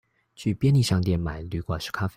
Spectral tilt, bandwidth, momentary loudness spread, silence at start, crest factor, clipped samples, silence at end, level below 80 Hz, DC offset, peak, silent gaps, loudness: -6.5 dB/octave; 15.5 kHz; 10 LU; 0.4 s; 14 dB; under 0.1%; 0.05 s; -46 dBFS; under 0.1%; -12 dBFS; none; -25 LUFS